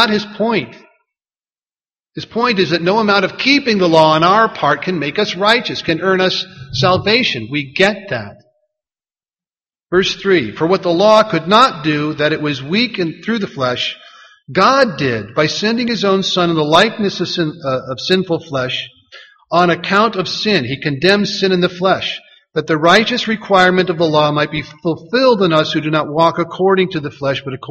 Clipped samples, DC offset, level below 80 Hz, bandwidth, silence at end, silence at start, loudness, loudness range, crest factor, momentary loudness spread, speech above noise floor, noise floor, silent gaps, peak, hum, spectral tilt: under 0.1%; under 0.1%; -52 dBFS; 8.8 kHz; 0 s; 0 s; -14 LUFS; 4 LU; 16 dB; 10 LU; over 76 dB; under -90 dBFS; none; 0 dBFS; none; -5 dB/octave